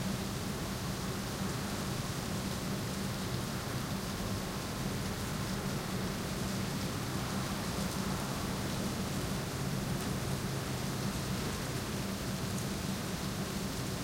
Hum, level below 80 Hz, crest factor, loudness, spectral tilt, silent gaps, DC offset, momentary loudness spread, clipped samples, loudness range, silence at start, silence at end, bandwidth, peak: none; -48 dBFS; 14 dB; -36 LUFS; -4.5 dB/octave; none; under 0.1%; 1 LU; under 0.1%; 1 LU; 0 s; 0 s; 16 kHz; -22 dBFS